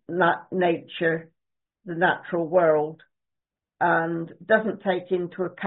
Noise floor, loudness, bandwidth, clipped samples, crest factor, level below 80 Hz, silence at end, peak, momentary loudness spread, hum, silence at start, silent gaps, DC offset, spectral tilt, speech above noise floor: -86 dBFS; -24 LUFS; 4.1 kHz; under 0.1%; 18 dB; -70 dBFS; 0 s; -6 dBFS; 9 LU; none; 0.1 s; none; under 0.1%; -4.5 dB/octave; 63 dB